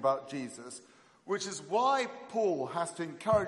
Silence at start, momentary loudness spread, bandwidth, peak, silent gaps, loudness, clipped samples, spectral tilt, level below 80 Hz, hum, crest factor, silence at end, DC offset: 0 s; 14 LU; 11.5 kHz; -14 dBFS; none; -33 LUFS; under 0.1%; -4.5 dB/octave; -66 dBFS; none; 18 dB; 0 s; under 0.1%